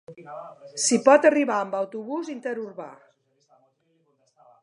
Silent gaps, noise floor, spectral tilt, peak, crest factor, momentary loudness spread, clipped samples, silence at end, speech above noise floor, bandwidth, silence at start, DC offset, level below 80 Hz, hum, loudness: none; -68 dBFS; -3 dB/octave; -2 dBFS; 22 dB; 24 LU; under 0.1%; 1.7 s; 45 dB; 11.5 kHz; 0.1 s; under 0.1%; -84 dBFS; none; -22 LUFS